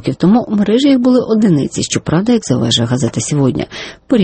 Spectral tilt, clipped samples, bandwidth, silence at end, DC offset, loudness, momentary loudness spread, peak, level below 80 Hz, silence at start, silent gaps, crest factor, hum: -5.5 dB/octave; under 0.1%; 8.8 kHz; 0 s; under 0.1%; -13 LUFS; 6 LU; 0 dBFS; -44 dBFS; 0 s; none; 12 dB; none